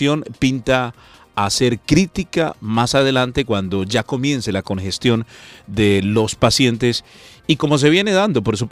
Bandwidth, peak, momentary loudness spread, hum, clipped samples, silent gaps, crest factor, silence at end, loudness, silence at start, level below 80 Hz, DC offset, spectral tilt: 15.5 kHz; 0 dBFS; 8 LU; none; under 0.1%; none; 18 dB; 0 s; -17 LUFS; 0 s; -42 dBFS; under 0.1%; -5 dB/octave